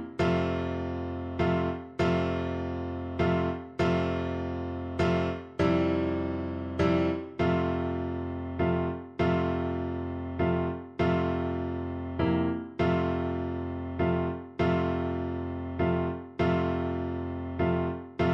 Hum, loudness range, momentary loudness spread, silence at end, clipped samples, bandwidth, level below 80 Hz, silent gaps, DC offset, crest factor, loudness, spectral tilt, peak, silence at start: none; 1 LU; 7 LU; 0 s; under 0.1%; 7.2 kHz; -52 dBFS; none; under 0.1%; 16 dB; -30 LUFS; -8.5 dB/octave; -14 dBFS; 0 s